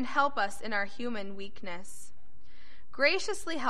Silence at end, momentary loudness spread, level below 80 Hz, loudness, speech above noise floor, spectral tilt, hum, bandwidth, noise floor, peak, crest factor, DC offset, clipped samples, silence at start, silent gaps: 0 s; 19 LU; -62 dBFS; -32 LUFS; 27 dB; -3 dB/octave; none; 13 kHz; -59 dBFS; -10 dBFS; 22 dB; 3%; under 0.1%; 0 s; none